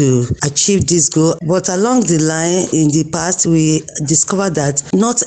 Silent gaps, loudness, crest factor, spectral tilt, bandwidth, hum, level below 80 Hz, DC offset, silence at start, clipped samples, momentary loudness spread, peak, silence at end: none; -14 LUFS; 12 dB; -4.5 dB/octave; 9.6 kHz; none; -42 dBFS; under 0.1%; 0 s; under 0.1%; 4 LU; -2 dBFS; 0 s